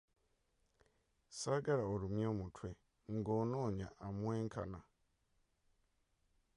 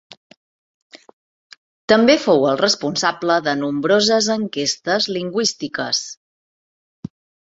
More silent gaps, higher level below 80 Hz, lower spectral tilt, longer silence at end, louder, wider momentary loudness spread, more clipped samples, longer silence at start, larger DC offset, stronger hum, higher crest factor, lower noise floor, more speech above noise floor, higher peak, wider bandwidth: second, none vs 1.13-1.50 s, 1.58-1.88 s; about the same, -64 dBFS vs -62 dBFS; first, -6.5 dB/octave vs -3 dB/octave; first, 1.75 s vs 1.25 s; second, -41 LUFS vs -17 LUFS; second, 14 LU vs 20 LU; neither; first, 1.3 s vs 0.95 s; neither; neither; about the same, 18 dB vs 18 dB; second, -80 dBFS vs under -90 dBFS; second, 40 dB vs over 72 dB; second, -26 dBFS vs -2 dBFS; first, 11 kHz vs 8 kHz